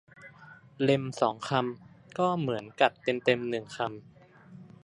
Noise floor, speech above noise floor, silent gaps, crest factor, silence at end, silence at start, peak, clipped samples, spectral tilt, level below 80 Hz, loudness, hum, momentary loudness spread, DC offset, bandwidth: -53 dBFS; 24 dB; none; 24 dB; 0.2 s; 0.2 s; -6 dBFS; under 0.1%; -6 dB/octave; -72 dBFS; -29 LUFS; none; 17 LU; under 0.1%; 11 kHz